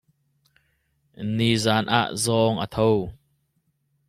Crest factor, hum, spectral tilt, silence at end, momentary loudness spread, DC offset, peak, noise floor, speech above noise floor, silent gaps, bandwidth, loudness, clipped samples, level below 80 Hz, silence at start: 20 dB; none; -5 dB/octave; 0.95 s; 8 LU; under 0.1%; -4 dBFS; -71 dBFS; 49 dB; none; 14 kHz; -22 LUFS; under 0.1%; -54 dBFS; 1.2 s